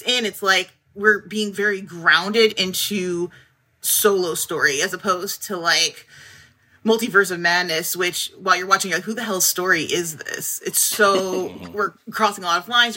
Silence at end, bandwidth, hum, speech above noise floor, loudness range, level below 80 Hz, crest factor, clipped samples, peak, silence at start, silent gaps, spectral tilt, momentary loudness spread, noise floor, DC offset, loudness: 0 s; 16.5 kHz; none; 31 dB; 1 LU; -68 dBFS; 18 dB; under 0.1%; -2 dBFS; 0 s; none; -1.5 dB/octave; 9 LU; -51 dBFS; under 0.1%; -19 LUFS